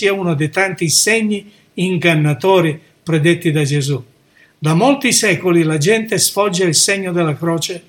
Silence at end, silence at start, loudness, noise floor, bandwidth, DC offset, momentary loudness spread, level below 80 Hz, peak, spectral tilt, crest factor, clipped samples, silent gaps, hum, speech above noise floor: 0.1 s; 0 s; -14 LUFS; -51 dBFS; 18 kHz; under 0.1%; 9 LU; -60 dBFS; 0 dBFS; -4 dB/octave; 16 dB; under 0.1%; none; none; 36 dB